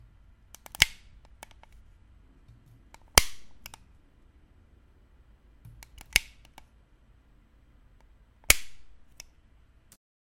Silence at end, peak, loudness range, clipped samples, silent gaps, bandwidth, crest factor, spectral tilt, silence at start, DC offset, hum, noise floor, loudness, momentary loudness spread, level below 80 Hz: 1.5 s; 0 dBFS; 7 LU; under 0.1%; none; 16.5 kHz; 34 dB; -0.5 dB/octave; 0.8 s; under 0.1%; none; -60 dBFS; -25 LUFS; 29 LU; -46 dBFS